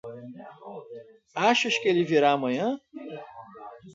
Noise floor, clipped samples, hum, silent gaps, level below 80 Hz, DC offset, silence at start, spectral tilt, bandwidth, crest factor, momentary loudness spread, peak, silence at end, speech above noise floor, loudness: -45 dBFS; under 0.1%; none; none; -76 dBFS; under 0.1%; 0.05 s; -4.5 dB/octave; 8 kHz; 22 dB; 23 LU; -6 dBFS; 0.05 s; 20 dB; -24 LUFS